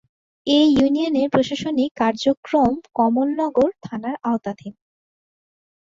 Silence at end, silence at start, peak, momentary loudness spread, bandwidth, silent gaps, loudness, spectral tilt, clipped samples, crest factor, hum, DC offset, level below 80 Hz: 1.25 s; 0.45 s; -2 dBFS; 13 LU; 7.6 kHz; 1.91-1.95 s, 2.37-2.43 s; -20 LUFS; -5.5 dB/octave; under 0.1%; 18 dB; none; under 0.1%; -54 dBFS